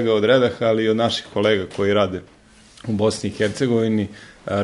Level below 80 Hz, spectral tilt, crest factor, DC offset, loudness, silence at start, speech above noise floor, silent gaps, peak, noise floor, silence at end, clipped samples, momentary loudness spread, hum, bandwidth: -54 dBFS; -5.5 dB/octave; 16 dB; under 0.1%; -20 LUFS; 0 s; 28 dB; none; -4 dBFS; -48 dBFS; 0 s; under 0.1%; 11 LU; none; 11.5 kHz